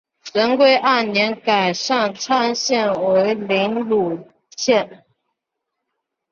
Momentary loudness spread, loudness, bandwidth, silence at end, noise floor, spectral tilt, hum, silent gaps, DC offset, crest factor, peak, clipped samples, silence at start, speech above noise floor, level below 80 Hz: 10 LU; -18 LUFS; 7.4 kHz; 1.4 s; -79 dBFS; -3.5 dB/octave; none; none; under 0.1%; 16 dB; -2 dBFS; under 0.1%; 0.25 s; 62 dB; -64 dBFS